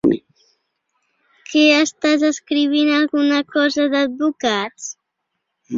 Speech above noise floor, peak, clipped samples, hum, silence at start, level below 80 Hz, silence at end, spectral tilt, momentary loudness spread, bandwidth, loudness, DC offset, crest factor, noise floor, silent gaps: 59 dB; -2 dBFS; under 0.1%; none; 0.05 s; -62 dBFS; 0 s; -3 dB/octave; 10 LU; 7.6 kHz; -17 LUFS; under 0.1%; 16 dB; -76 dBFS; none